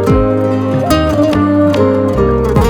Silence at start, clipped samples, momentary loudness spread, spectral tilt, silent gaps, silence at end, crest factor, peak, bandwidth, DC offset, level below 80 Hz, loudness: 0 s; under 0.1%; 3 LU; -7.5 dB/octave; none; 0 s; 10 dB; 0 dBFS; 18.5 kHz; under 0.1%; -22 dBFS; -12 LUFS